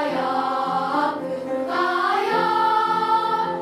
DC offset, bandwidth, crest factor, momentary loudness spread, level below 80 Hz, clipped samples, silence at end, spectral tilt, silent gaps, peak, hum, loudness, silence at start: under 0.1%; 14.5 kHz; 14 dB; 6 LU; -72 dBFS; under 0.1%; 0 s; -5 dB/octave; none; -8 dBFS; none; -21 LUFS; 0 s